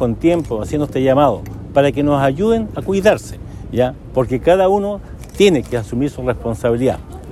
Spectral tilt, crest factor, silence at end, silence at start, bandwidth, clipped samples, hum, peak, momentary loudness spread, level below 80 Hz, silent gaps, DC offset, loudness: -6.5 dB/octave; 16 dB; 0 s; 0 s; 14 kHz; under 0.1%; none; -2 dBFS; 11 LU; -34 dBFS; none; under 0.1%; -16 LUFS